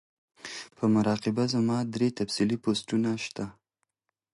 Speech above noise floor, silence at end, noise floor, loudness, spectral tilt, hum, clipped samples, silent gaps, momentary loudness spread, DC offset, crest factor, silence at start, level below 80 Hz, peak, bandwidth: 55 dB; 0.85 s; -82 dBFS; -28 LUFS; -5.5 dB/octave; none; under 0.1%; none; 15 LU; under 0.1%; 16 dB; 0.45 s; -64 dBFS; -14 dBFS; 11.5 kHz